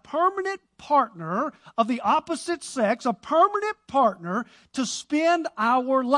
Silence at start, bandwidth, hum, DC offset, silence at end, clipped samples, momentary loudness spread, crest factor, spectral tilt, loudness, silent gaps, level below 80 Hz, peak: 0.1 s; 11.5 kHz; none; under 0.1%; 0 s; under 0.1%; 9 LU; 18 dB; -4.5 dB/octave; -24 LUFS; none; -70 dBFS; -6 dBFS